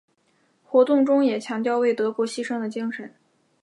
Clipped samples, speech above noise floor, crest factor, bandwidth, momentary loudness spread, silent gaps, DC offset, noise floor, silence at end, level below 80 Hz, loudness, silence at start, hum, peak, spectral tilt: under 0.1%; 44 dB; 18 dB; 11.5 kHz; 12 LU; none; under 0.1%; -66 dBFS; 0.55 s; -80 dBFS; -22 LUFS; 0.7 s; none; -6 dBFS; -5 dB/octave